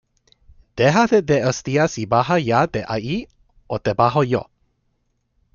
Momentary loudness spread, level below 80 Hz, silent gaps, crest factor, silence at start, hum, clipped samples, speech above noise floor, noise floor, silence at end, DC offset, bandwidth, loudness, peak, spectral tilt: 10 LU; -50 dBFS; none; 18 dB; 0.75 s; none; under 0.1%; 50 dB; -68 dBFS; 1.1 s; under 0.1%; 7.4 kHz; -19 LUFS; -2 dBFS; -6 dB/octave